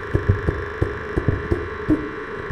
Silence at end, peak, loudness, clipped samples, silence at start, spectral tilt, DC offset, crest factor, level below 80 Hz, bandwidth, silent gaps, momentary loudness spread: 0 s; -2 dBFS; -24 LUFS; under 0.1%; 0 s; -8.5 dB/octave; under 0.1%; 20 dB; -32 dBFS; 9.2 kHz; none; 4 LU